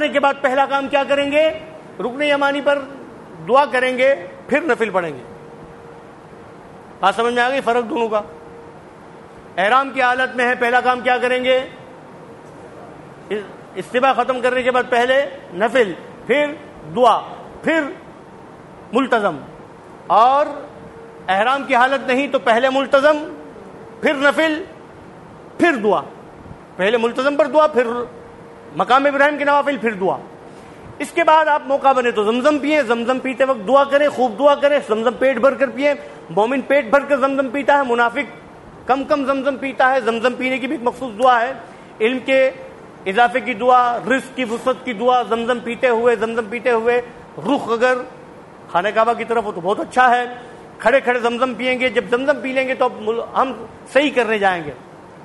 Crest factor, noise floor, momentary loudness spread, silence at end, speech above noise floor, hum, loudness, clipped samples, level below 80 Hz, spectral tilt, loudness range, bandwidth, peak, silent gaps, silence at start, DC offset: 16 dB; -39 dBFS; 17 LU; 0 s; 23 dB; none; -17 LUFS; under 0.1%; -58 dBFS; -4.5 dB/octave; 4 LU; 11.5 kHz; -2 dBFS; none; 0 s; under 0.1%